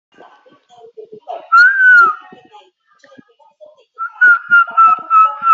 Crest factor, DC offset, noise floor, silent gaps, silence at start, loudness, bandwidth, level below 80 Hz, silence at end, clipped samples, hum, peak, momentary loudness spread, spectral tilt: 12 dB; under 0.1%; -50 dBFS; none; 1 s; -9 LUFS; 7.4 kHz; -78 dBFS; 0 s; under 0.1%; none; -2 dBFS; 21 LU; 3 dB/octave